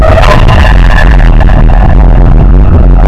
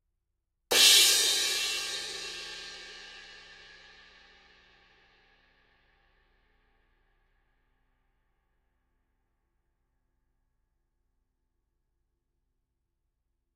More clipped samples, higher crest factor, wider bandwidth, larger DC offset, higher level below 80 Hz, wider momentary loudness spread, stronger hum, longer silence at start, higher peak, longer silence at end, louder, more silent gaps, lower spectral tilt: first, 10% vs under 0.1%; second, 2 dB vs 26 dB; second, 6.8 kHz vs 16 kHz; first, 10% vs under 0.1%; first, -2 dBFS vs -70 dBFS; second, 2 LU vs 27 LU; neither; second, 0 s vs 0.7 s; first, 0 dBFS vs -8 dBFS; second, 0 s vs 10.2 s; first, -5 LUFS vs -22 LUFS; neither; first, -7.5 dB/octave vs 2.5 dB/octave